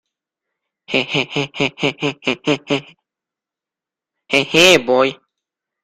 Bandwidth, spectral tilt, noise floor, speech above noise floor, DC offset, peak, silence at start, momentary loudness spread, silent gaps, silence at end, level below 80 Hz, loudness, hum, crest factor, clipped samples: 14 kHz; -3.5 dB/octave; -87 dBFS; 71 dB; under 0.1%; 0 dBFS; 0.9 s; 11 LU; none; 0.7 s; -56 dBFS; -16 LUFS; none; 20 dB; under 0.1%